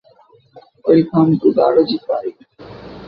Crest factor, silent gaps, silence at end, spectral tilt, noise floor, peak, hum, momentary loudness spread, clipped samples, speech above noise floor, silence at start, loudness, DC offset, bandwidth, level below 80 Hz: 16 dB; none; 0 s; -10.5 dB/octave; -50 dBFS; -2 dBFS; none; 17 LU; under 0.1%; 36 dB; 0.55 s; -15 LUFS; under 0.1%; 5.4 kHz; -54 dBFS